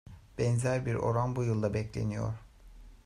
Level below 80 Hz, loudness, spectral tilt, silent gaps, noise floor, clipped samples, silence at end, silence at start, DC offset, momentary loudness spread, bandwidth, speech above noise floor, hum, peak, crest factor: -52 dBFS; -32 LUFS; -7 dB/octave; none; -52 dBFS; under 0.1%; 0.1 s; 0.05 s; under 0.1%; 8 LU; 11 kHz; 22 dB; none; -16 dBFS; 16 dB